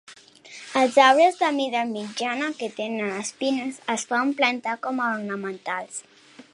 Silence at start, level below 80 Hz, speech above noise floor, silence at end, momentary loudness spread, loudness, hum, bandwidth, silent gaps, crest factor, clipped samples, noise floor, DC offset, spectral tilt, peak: 0.1 s; -80 dBFS; 23 dB; 0.1 s; 14 LU; -23 LUFS; none; 11.5 kHz; none; 22 dB; under 0.1%; -47 dBFS; under 0.1%; -3 dB/octave; -2 dBFS